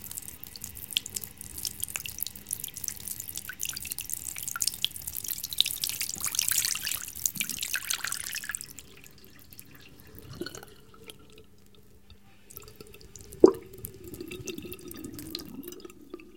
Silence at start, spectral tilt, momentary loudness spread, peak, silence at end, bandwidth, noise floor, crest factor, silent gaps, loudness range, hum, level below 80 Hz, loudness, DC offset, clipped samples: 0 s; -1.5 dB/octave; 23 LU; 0 dBFS; 0.05 s; 17 kHz; -58 dBFS; 34 dB; none; 18 LU; none; -58 dBFS; -31 LUFS; 0.2%; under 0.1%